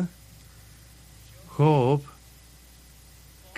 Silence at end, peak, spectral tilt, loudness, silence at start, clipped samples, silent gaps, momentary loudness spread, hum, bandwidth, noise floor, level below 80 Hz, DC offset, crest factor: 1.55 s; -8 dBFS; -8 dB/octave; -24 LUFS; 0 s; under 0.1%; none; 27 LU; none; 15.5 kHz; -51 dBFS; -54 dBFS; under 0.1%; 22 dB